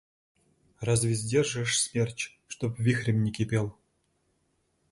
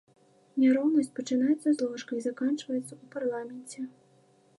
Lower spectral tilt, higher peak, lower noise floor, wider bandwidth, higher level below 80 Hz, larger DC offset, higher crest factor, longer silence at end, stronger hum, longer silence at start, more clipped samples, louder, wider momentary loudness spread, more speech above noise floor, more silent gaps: about the same, -4.5 dB/octave vs -5 dB/octave; about the same, -12 dBFS vs -14 dBFS; first, -73 dBFS vs -63 dBFS; about the same, 11.5 kHz vs 11.5 kHz; first, -56 dBFS vs -88 dBFS; neither; about the same, 18 dB vs 16 dB; first, 1.2 s vs 0.7 s; neither; first, 0.8 s vs 0.55 s; neither; about the same, -28 LUFS vs -29 LUFS; second, 10 LU vs 16 LU; first, 45 dB vs 35 dB; neither